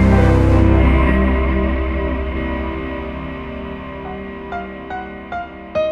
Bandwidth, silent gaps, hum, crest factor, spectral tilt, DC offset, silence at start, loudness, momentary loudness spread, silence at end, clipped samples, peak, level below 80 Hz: 6 kHz; none; none; 16 dB; -8.5 dB/octave; under 0.1%; 0 s; -19 LUFS; 16 LU; 0 s; under 0.1%; 0 dBFS; -20 dBFS